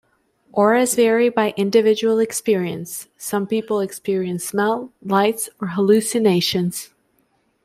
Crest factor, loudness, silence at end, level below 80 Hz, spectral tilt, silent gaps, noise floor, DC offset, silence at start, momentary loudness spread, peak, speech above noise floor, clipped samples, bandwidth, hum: 16 dB; -19 LUFS; 0.8 s; -64 dBFS; -4.5 dB/octave; none; -64 dBFS; under 0.1%; 0.55 s; 10 LU; -4 dBFS; 45 dB; under 0.1%; 15.5 kHz; none